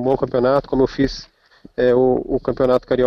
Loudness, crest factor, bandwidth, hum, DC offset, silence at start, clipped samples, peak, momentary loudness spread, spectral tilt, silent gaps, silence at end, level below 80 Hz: -18 LUFS; 12 dB; 6.6 kHz; none; under 0.1%; 0 s; under 0.1%; -6 dBFS; 7 LU; -7.5 dB/octave; none; 0 s; -40 dBFS